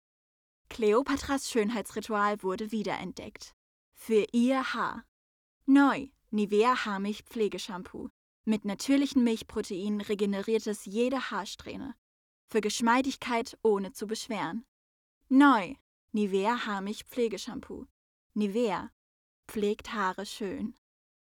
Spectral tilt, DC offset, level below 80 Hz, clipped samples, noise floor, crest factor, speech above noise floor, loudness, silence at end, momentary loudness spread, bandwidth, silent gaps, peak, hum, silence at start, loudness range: -5 dB/octave; under 0.1%; -62 dBFS; under 0.1%; under -90 dBFS; 20 dB; over 61 dB; -30 LUFS; 0.6 s; 16 LU; 17 kHz; 3.53-3.92 s, 5.08-5.61 s, 8.10-8.44 s, 11.98-12.48 s, 14.68-15.21 s, 15.81-16.08 s, 17.91-18.30 s, 18.93-19.43 s; -10 dBFS; none; 0.7 s; 5 LU